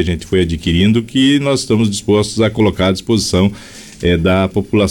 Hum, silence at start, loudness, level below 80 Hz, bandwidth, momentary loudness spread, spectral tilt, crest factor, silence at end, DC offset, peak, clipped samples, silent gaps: none; 0 s; -14 LUFS; -34 dBFS; 18.5 kHz; 4 LU; -5.5 dB/octave; 10 dB; 0 s; under 0.1%; -4 dBFS; under 0.1%; none